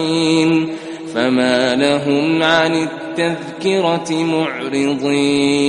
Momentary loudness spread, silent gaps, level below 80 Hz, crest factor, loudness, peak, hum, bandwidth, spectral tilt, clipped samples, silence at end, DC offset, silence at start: 7 LU; none; -56 dBFS; 16 dB; -16 LUFS; 0 dBFS; none; 10.5 kHz; -5 dB/octave; under 0.1%; 0 s; under 0.1%; 0 s